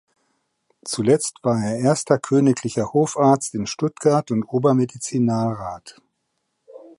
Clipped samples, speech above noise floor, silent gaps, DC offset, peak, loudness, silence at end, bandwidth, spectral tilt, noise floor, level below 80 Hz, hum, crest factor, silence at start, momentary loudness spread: under 0.1%; 54 dB; none; under 0.1%; -2 dBFS; -20 LUFS; 0.1 s; 11.5 kHz; -6 dB/octave; -74 dBFS; -58 dBFS; none; 18 dB; 0.85 s; 8 LU